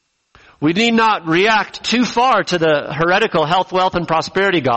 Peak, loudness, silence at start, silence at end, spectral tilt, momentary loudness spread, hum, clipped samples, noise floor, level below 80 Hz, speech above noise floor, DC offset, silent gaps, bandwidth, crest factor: -4 dBFS; -15 LUFS; 0.6 s; 0 s; -4.5 dB/octave; 5 LU; none; under 0.1%; -50 dBFS; -48 dBFS; 35 dB; under 0.1%; none; 8.4 kHz; 12 dB